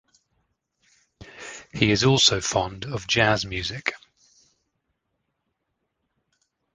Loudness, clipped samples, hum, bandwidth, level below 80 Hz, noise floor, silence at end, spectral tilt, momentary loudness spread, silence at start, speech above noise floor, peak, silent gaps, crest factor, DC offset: -22 LUFS; under 0.1%; none; 10 kHz; -50 dBFS; -78 dBFS; 2.75 s; -3.5 dB/octave; 20 LU; 1.2 s; 55 dB; -2 dBFS; none; 26 dB; under 0.1%